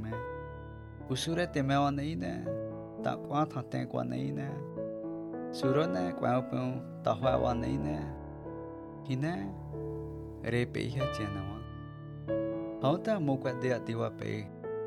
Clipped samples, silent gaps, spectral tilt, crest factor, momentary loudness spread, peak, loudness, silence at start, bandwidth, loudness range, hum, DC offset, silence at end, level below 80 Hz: under 0.1%; none; -7 dB/octave; 18 dB; 13 LU; -14 dBFS; -34 LUFS; 0 s; 13 kHz; 4 LU; none; under 0.1%; 0 s; -52 dBFS